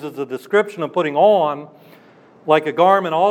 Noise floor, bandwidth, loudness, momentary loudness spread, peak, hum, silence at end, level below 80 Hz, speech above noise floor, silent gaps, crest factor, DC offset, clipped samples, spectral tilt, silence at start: -48 dBFS; 14.5 kHz; -17 LUFS; 13 LU; -2 dBFS; none; 0 s; -80 dBFS; 31 dB; none; 16 dB; under 0.1%; under 0.1%; -6 dB/octave; 0 s